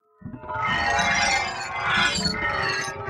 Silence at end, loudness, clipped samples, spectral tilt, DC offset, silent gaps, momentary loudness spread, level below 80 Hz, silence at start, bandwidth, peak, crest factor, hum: 0 s; -22 LUFS; under 0.1%; -2.5 dB/octave; under 0.1%; none; 10 LU; -46 dBFS; 0.2 s; 15 kHz; -10 dBFS; 16 dB; none